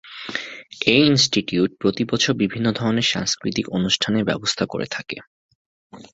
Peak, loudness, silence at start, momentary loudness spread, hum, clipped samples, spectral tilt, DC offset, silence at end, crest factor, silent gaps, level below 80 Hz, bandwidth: -2 dBFS; -20 LUFS; 0.05 s; 14 LU; none; under 0.1%; -4 dB/octave; under 0.1%; 0.05 s; 20 dB; 5.27-5.49 s, 5.55-5.90 s; -54 dBFS; 8 kHz